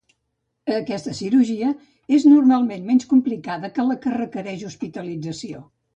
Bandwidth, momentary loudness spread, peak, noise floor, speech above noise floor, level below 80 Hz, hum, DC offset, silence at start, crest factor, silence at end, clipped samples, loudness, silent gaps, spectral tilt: 8.4 kHz; 17 LU; -4 dBFS; -75 dBFS; 55 dB; -64 dBFS; none; under 0.1%; 0.65 s; 16 dB; 0.35 s; under 0.1%; -20 LUFS; none; -6 dB/octave